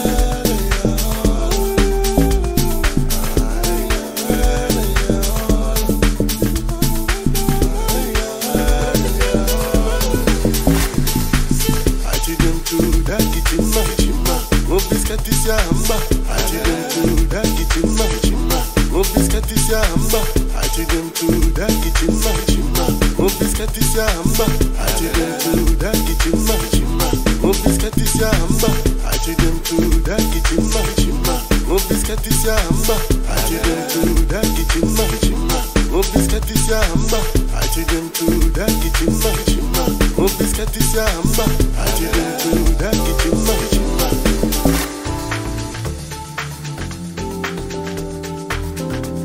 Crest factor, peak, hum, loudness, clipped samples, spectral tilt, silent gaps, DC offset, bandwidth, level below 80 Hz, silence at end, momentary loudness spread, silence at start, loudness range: 14 dB; 0 dBFS; none; -18 LUFS; under 0.1%; -4.5 dB/octave; none; under 0.1%; 16.5 kHz; -18 dBFS; 0 s; 4 LU; 0 s; 1 LU